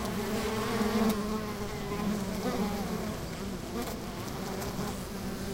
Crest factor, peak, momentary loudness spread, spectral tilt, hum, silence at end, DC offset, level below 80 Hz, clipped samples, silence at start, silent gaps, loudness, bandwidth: 16 dB; -16 dBFS; 8 LU; -5 dB/octave; none; 0 s; under 0.1%; -46 dBFS; under 0.1%; 0 s; none; -33 LUFS; 16 kHz